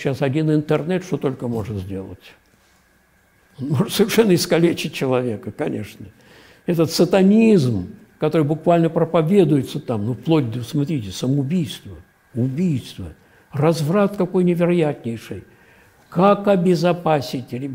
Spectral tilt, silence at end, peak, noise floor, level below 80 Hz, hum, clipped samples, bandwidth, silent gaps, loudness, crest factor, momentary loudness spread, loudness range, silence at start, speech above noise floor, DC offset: -6.5 dB/octave; 0 s; -2 dBFS; -58 dBFS; -54 dBFS; none; under 0.1%; 16 kHz; none; -19 LUFS; 16 dB; 16 LU; 6 LU; 0 s; 39 dB; under 0.1%